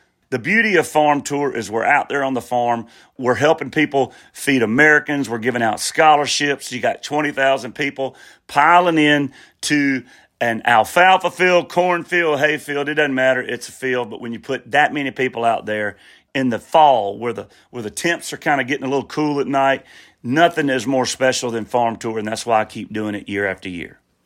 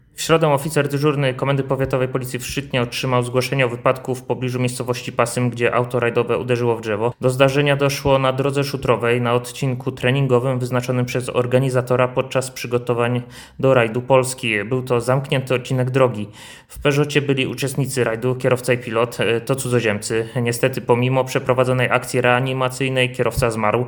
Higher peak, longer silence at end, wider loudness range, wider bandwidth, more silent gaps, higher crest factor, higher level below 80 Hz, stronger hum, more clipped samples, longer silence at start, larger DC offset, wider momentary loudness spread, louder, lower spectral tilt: about the same, 0 dBFS vs 0 dBFS; first, 0.35 s vs 0 s; about the same, 4 LU vs 2 LU; second, 16.5 kHz vs 19 kHz; neither; about the same, 18 dB vs 18 dB; second, -62 dBFS vs -48 dBFS; neither; neither; first, 0.3 s vs 0.15 s; neither; first, 13 LU vs 6 LU; about the same, -18 LUFS vs -19 LUFS; second, -4 dB/octave vs -5.5 dB/octave